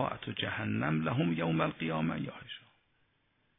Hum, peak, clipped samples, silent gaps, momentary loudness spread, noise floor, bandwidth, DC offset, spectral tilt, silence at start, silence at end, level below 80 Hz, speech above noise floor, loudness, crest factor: none; -14 dBFS; under 0.1%; none; 13 LU; -74 dBFS; 3.8 kHz; under 0.1%; -10 dB/octave; 0 s; 1 s; -64 dBFS; 41 dB; -33 LUFS; 20 dB